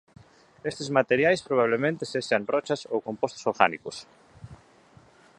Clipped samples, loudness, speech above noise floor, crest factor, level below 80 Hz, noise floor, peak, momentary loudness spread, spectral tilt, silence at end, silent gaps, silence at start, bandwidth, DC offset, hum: under 0.1%; -26 LUFS; 30 dB; 26 dB; -64 dBFS; -56 dBFS; -2 dBFS; 13 LU; -5 dB/octave; 0.85 s; none; 0.65 s; 11 kHz; under 0.1%; none